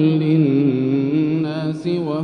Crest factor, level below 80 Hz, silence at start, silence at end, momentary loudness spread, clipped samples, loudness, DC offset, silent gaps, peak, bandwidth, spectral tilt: 12 dB; -62 dBFS; 0 s; 0 s; 7 LU; under 0.1%; -18 LUFS; under 0.1%; none; -6 dBFS; 6.2 kHz; -9.5 dB/octave